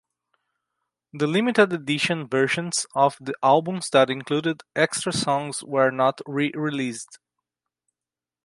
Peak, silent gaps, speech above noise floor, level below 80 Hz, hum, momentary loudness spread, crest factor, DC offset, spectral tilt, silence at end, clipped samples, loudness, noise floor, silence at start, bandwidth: -4 dBFS; none; over 67 dB; -68 dBFS; none; 7 LU; 20 dB; under 0.1%; -4 dB/octave; 1.3 s; under 0.1%; -23 LUFS; under -90 dBFS; 1.15 s; 11.5 kHz